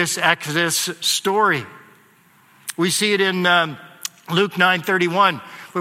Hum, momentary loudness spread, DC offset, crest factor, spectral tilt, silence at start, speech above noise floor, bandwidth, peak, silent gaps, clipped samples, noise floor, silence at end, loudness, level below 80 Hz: none; 15 LU; under 0.1%; 20 dB; -3 dB/octave; 0 s; 35 dB; 16.5 kHz; 0 dBFS; none; under 0.1%; -54 dBFS; 0 s; -18 LUFS; -70 dBFS